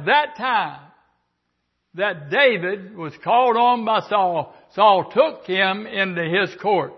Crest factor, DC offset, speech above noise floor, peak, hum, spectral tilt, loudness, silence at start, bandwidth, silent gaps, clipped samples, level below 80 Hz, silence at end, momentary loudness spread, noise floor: 18 dB; under 0.1%; 54 dB; -4 dBFS; none; -6.5 dB/octave; -19 LUFS; 0 s; 6.2 kHz; none; under 0.1%; -70 dBFS; 0 s; 12 LU; -73 dBFS